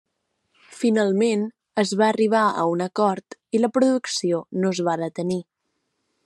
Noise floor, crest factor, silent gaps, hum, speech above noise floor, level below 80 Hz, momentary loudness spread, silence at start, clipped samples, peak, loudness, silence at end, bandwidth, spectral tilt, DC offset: -75 dBFS; 16 dB; none; none; 54 dB; -74 dBFS; 8 LU; 0.7 s; under 0.1%; -6 dBFS; -22 LUFS; 0.85 s; 12 kHz; -5 dB/octave; under 0.1%